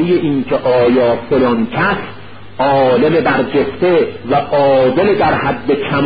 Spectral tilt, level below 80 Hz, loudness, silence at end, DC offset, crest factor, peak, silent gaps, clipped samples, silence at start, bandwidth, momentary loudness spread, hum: -12 dB/octave; -42 dBFS; -13 LUFS; 0 s; 1%; 12 dB; 0 dBFS; none; under 0.1%; 0 s; 5 kHz; 5 LU; none